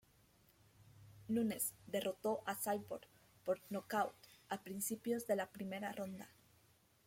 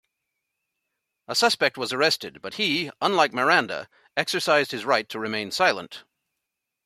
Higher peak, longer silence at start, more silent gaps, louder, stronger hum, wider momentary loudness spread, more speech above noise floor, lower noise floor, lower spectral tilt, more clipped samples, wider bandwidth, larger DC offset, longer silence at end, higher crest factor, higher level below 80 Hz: second, -24 dBFS vs -4 dBFS; second, 0.8 s vs 1.3 s; neither; second, -42 LUFS vs -23 LUFS; neither; about the same, 12 LU vs 12 LU; second, 30 dB vs 59 dB; second, -72 dBFS vs -83 dBFS; first, -4 dB/octave vs -2.5 dB/octave; neither; about the same, 16.5 kHz vs 15.5 kHz; neither; about the same, 0.75 s vs 0.85 s; about the same, 18 dB vs 22 dB; second, -78 dBFS vs -72 dBFS